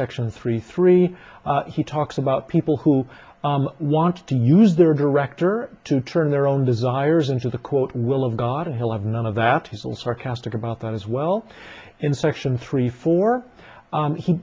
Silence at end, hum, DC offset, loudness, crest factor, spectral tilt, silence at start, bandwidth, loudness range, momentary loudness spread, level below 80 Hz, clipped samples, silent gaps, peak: 0 s; none; under 0.1%; -21 LUFS; 18 dB; -8.5 dB/octave; 0 s; 7.6 kHz; 6 LU; 11 LU; -54 dBFS; under 0.1%; none; -4 dBFS